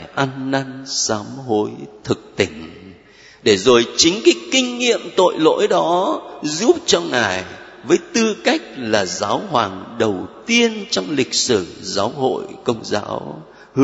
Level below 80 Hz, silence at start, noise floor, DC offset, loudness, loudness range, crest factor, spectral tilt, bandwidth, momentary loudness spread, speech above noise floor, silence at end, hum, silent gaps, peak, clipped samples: -56 dBFS; 0 s; -45 dBFS; under 0.1%; -18 LUFS; 4 LU; 18 dB; -3 dB/octave; 8 kHz; 10 LU; 27 dB; 0 s; none; none; 0 dBFS; under 0.1%